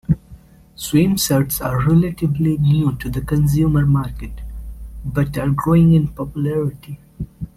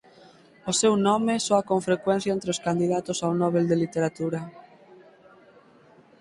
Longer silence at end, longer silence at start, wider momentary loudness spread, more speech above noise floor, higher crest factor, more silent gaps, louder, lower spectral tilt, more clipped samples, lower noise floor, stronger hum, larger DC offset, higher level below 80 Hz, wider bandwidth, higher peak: second, 0.1 s vs 1.6 s; second, 0.1 s vs 0.65 s; first, 18 LU vs 8 LU; second, 26 dB vs 31 dB; about the same, 14 dB vs 18 dB; neither; first, -17 LUFS vs -24 LUFS; first, -6.5 dB/octave vs -5 dB/octave; neither; second, -43 dBFS vs -55 dBFS; neither; neither; first, -34 dBFS vs -64 dBFS; first, 16 kHz vs 11.5 kHz; first, -4 dBFS vs -8 dBFS